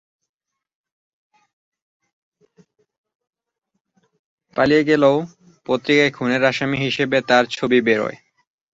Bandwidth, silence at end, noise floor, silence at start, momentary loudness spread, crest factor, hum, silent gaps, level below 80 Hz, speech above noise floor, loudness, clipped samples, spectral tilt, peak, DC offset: 8 kHz; 0.6 s; -66 dBFS; 4.55 s; 10 LU; 20 dB; none; none; -60 dBFS; 49 dB; -18 LUFS; under 0.1%; -5.5 dB/octave; -2 dBFS; under 0.1%